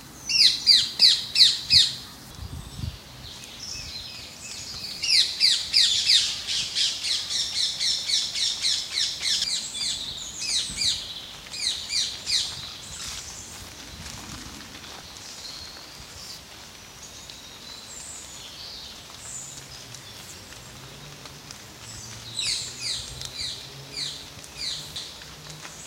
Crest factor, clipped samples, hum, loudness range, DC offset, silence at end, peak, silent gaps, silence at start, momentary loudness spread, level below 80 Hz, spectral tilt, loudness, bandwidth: 26 dB; under 0.1%; none; 18 LU; under 0.1%; 0 s; -2 dBFS; none; 0 s; 23 LU; -52 dBFS; 0.5 dB/octave; -22 LUFS; 16 kHz